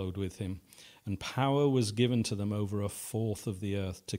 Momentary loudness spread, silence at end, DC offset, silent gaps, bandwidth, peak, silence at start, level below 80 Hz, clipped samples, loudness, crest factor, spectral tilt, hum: 12 LU; 0 s; under 0.1%; none; 16 kHz; -16 dBFS; 0 s; -60 dBFS; under 0.1%; -33 LUFS; 18 dB; -6 dB/octave; none